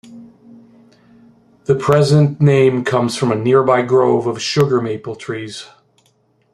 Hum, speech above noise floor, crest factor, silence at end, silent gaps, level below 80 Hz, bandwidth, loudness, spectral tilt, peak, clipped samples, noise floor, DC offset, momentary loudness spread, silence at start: none; 44 dB; 16 dB; 0.9 s; none; -56 dBFS; 12.5 kHz; -15 LUFS; -6.5 dB/octave; -2 dBFS; under 0.1%; -59 dBFS; under 0.1%; 14 LU; 0.1 s